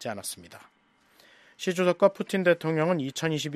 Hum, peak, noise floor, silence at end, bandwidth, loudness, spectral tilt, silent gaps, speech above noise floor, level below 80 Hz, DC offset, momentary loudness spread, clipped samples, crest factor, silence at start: none; -6 dBFS; -62 dBFS; 0 s; 14.5 kHz; -26 LUFS; -5 dB/octave; none; 35 dB; -74 dBFS; under 0.1%; 12 LU; under 0.1%; 20 dB; 0 s